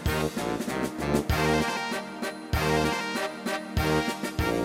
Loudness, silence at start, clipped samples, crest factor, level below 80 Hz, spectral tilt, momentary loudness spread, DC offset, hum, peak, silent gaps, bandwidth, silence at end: -28 LUFS; 0 s; under 0.1%; 18 dB; -38 dBFS; -5 dB/octave; 7 LU; under 0.1%; none; -10 dBFS; none; 16.5 kHz; 0 s